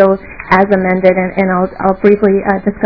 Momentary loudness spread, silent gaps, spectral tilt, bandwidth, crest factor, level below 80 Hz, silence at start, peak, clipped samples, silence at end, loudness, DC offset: 4 LU; none; -9.5 dB/octave; 5.4 kHz; 12 dB; -38 dBFS; 0 s; 0 dBFS; 1%; 0 s; -12 LUFS; 0.8%